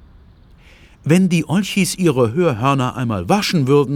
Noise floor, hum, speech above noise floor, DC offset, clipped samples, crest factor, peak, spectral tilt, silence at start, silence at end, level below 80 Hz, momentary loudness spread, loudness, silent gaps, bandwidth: -46 dBFS; none; 30 dB; under 0.1%; under 0.1%; 16 dB; -2 dBFS; -6 dB/octave; 1.05 s; 0 s; -48 dBFS; 5 LU; -17 LUFS; none; 16.5 kHz